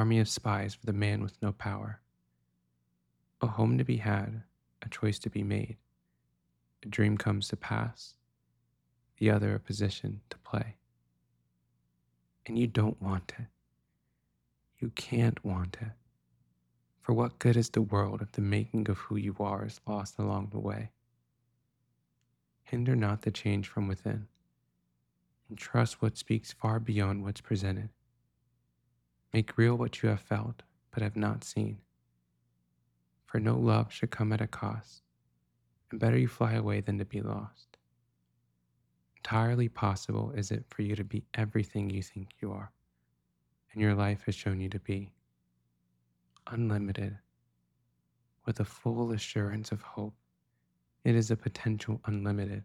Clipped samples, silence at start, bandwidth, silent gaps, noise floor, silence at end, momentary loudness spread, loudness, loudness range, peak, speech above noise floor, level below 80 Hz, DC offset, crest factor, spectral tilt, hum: under 0.1%; 0 s; 11.5 kHz; none; -78 dBFS; 0 s; 14 LU; -33 LUFS; 5 LU; -12 dBFS; 47 dB; -62 dBFS; under 0.1%; 20 dB; -7 dB/octave; 60 Hz at -55 dBFS